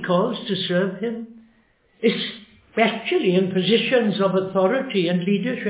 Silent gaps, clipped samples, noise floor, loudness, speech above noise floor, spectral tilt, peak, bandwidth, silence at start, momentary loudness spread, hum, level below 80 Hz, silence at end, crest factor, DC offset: none; under 0.1%; -60 dBFS; -21 LUFS; 39 dB; -10 dB/octave; -4 dBFS; 4 kHz; 0 s; 10 LU; none; -68 dBFS; 0 s; 16 dB; under 0.1%